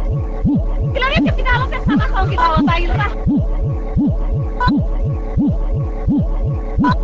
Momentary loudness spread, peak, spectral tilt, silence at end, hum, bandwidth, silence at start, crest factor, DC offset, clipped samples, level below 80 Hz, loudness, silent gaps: 5 LU; -2 dBFS; -8 dB/octave; 0 s; none; 7.2 kHz; 0 s; 14 dB; 0.5%; under 0.1%; -20 dBFS; -17 LUFS; none